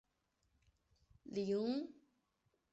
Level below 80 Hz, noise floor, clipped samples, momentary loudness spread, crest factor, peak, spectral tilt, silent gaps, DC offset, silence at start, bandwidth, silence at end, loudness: -78 dBFS; -83 dBFS; under 0.1%; 15 LU; 16 dB; -30 dBFS; -6.5 dB/octave; none; under 0.1%; 1.25 s; 8 kHz; 0.8 s; -41 LUFS